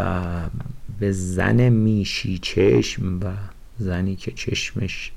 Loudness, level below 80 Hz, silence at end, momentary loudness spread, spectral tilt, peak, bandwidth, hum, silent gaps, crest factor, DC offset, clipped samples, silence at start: -22 LUFS; -38 dBFS; 0 s; 13 LU; -6 dB/octave; -8 dBFS; 12.5 kHz; none; none; 12 dB; under 0.1%; under 0.1%; 0 s